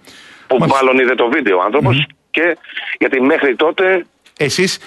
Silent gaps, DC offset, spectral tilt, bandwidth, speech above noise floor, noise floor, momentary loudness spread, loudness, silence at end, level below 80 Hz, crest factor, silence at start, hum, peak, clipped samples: none; under 0.1%; -5 dB/octave; 12 kHz; 26 dB; -40 dBFS; 7 LU; -14 LUFS; 0 s; -52 dBFS; 14 dB; 0.05 s; none; -2 dBFS; under 0.1%